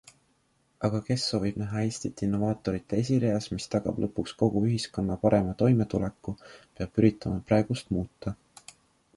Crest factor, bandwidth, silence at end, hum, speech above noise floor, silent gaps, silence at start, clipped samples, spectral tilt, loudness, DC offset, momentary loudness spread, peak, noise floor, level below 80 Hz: 20 dB; 11.5 kHz; 0.85 s; none; 42 dB; none; 0.8 s; under 0.1%; -6.5 dB/octave; -28 LUFS; under 0.1%; 10 LU; -8 dBFS; -69 dBFS; -50 dBFS